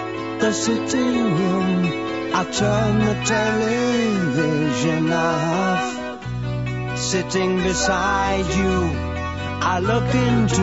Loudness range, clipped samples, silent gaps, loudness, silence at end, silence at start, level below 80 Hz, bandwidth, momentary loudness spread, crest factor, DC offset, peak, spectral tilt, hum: 2 LU; under 0.1%; none; -20 LUFS; 0 s; 0 s; -38 dBFS; 8 kHz; 7 LU; 14 dB; 0.3%; -6 dBFS; -5 dB/octave; none